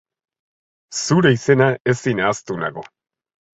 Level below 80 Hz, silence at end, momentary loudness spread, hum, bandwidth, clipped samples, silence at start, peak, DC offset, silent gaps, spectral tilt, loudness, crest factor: -56 dBFS; 0.75 s; 12 LU; none; 8.4 kHz; under 0.1%; 0.9 s; -2 dBFS; under 0.1%; 1.80-1.85 s; -5.5 dB/octave; -18 LUFS; 18 dB